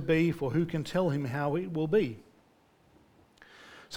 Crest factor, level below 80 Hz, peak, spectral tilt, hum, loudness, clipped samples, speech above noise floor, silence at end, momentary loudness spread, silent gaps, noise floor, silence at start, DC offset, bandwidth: 16 dB; -60 dBFS; -16 dBFS; -7.5 dB/octave; none; -30 LUFS; under 0.1%; 35 dB; 0 s; 18 LU; none; -64 dBFS; 0 s; under 0.1%; 17 kHz